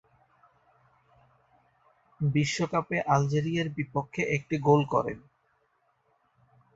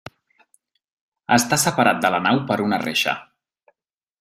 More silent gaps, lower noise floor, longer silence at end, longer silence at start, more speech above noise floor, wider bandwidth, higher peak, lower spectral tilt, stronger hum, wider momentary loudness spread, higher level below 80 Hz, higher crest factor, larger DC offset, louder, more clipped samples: neither; second, -71 dBFS vs -79 dBFS; first, 1.55 s vs 1 s; first, 2.2 s vs 1.3 s; second, 44 dB vs 59 dB; second, 8 kHz vs 16 kHz; second, -8 dBFS vs -2 dBFS; first, -6 dB/octave vs -3.5 dB/octave; neither; about the same, 8 LU vs 7 LU; about the same, -62 dBFS vs -62 dBFS; about the same, 22 dB vs 20 dB; neither; second, -28 LUFS vs -19 LUFS; neither